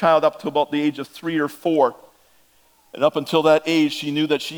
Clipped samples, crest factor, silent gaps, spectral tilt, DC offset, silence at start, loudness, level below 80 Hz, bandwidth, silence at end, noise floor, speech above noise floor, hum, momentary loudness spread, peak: under 0.1%; 18 dB; none; -5.5 dB/octave; under 0.1%; 0 s; -20 LUFS; -72 dBFS; over 20 kHz; 0 s; -57 dBFS; 38 dB; none; 7 LU; -2 dBFS